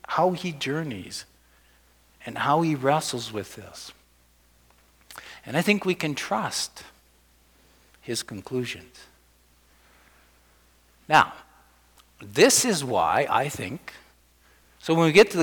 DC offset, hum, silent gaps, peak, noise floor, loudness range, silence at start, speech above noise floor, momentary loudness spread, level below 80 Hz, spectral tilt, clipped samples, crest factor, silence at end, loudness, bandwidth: under 0.1%; 60 Hz at -60 dBFS; none; -6 dBFS; -60 dBFS; 14 LU; 0.1 s; 36 dB; 23 LU; -62 dBFS; -3.5 dB/octave; under 0.1%; 22 dB; 0 s; -24 LUFS; 19.5 kHz